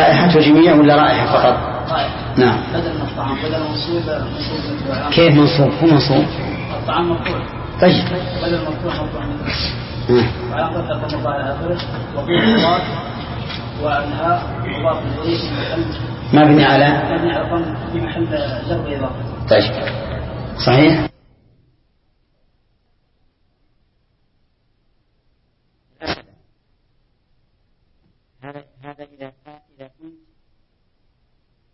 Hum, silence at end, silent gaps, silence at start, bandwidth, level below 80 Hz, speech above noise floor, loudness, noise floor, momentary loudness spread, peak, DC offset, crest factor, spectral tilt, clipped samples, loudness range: none; 1.65 s; none; 0 s; 6 kHz; -36 dBFS; 48 dB; -16 LUFS; -63 dBFS; 15 LU; 0 dBFS; under 0.1%; 16 dB; -9.5 dB/octave; under 0.1%; 21 LU